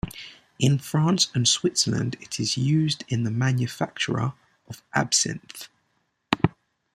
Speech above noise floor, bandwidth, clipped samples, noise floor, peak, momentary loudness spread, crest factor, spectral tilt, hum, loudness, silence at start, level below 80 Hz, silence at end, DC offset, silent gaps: 48 dB; 15.5 kHz; under 0.1%; -72 dBFS; -2 dBFS; 20 LU; 24 dB; -4 dB/octave; none; -24 LUFS; 0.05 s; -54 dBFS; 0.45 s; under 0.1%; none